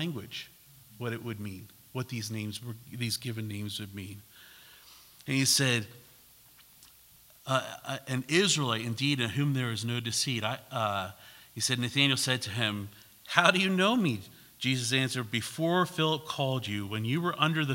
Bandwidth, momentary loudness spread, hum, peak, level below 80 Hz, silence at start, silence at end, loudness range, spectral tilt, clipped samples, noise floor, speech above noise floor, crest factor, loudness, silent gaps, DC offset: 16.5 kHz; 17 LU; none; -4 dBFS; -72 dBFS; 0 s; 0 s; 10 LU; -4 dB/octave; under 0.1%; -58 dBFS; 28 dB; 28 dB; -29 LUFS; none; under 0.1%